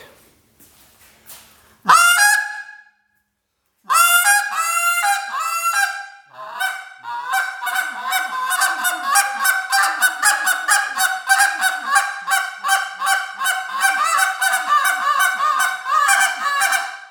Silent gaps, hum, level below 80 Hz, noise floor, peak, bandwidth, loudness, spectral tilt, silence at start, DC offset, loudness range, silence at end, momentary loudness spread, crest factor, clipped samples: none; none; -74 dBFS; -71 dBFS; -2 dBFS; over 20 kHz; -17 LUFS; 2.5 dB/octave; 0 s; under 0.1%; 5 LU; 0 s; 9 LU; 18 dB; under 0.1%